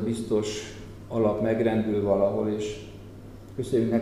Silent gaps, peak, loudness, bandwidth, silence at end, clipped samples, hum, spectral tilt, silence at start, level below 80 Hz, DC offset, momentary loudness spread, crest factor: none; -10 dBFS; -26 LUFS; 13.5 kHz; 0 s; under 0.1%; none; -6.5 dB/octave; 0 s; -50 dBFS; 0.1%; 19 LU; 16 dB